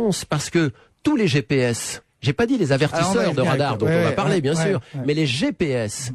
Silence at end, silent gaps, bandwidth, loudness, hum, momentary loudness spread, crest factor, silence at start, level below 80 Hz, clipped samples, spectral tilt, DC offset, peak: 0 s; none; 13 kHz; -21 LUFS; none; 6 LU; 12 dB; 0 s; -50 dBFS; under 0.1%; -5.5 dB/octave; under 0.1%; -8 dBFS